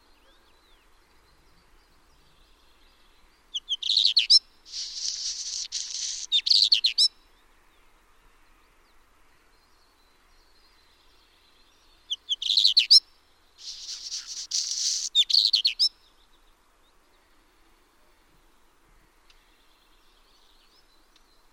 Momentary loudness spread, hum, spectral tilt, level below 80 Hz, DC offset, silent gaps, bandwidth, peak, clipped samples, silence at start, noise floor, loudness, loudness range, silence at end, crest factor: 18 LU; none; 4.5 dB/octave; -64 dBFS; under 0.1%; none; 16 kHz; -6 dBFS; under 0.1%; 3.55 s; -61 dBFS; -22 LUFS; 9 LU; 5.65 s; 24 dB